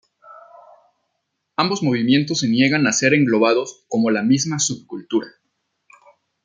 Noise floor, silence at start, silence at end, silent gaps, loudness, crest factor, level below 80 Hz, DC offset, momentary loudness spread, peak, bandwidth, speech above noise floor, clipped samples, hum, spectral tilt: -75 dBFS; 0.3 s; 1.15 s; none; -18 LUFS; 18 dB; -64 dBFS; under 0.1%; 9 LU; -2 dBFS; 9.6 kHz; 57 dB; under 0.1%; none; -4 dB/octave